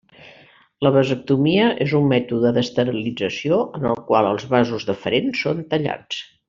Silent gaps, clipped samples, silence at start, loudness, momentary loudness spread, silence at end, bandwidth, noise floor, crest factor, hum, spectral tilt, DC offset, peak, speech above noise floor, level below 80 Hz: none; under 0.1%; 0.2 s; -20 LUFS; 7 LU; 0.25 s; 7.4 kHz; -50 dBFS; 16 dB; none; -5 dB/octave; under 0.1%; -4 dBFS; 31 dB; -56 dBFS